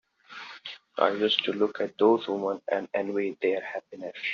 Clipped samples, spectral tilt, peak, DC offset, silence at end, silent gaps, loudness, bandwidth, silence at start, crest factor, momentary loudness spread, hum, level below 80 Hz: under 0.1%; -1.5 dB/octave; -4 dBFS; under 0.1%; 0 s; none; -27 LUFS; 7 kHz; 0.3 s; 24 dB; 17 LU; none; -76 dBFS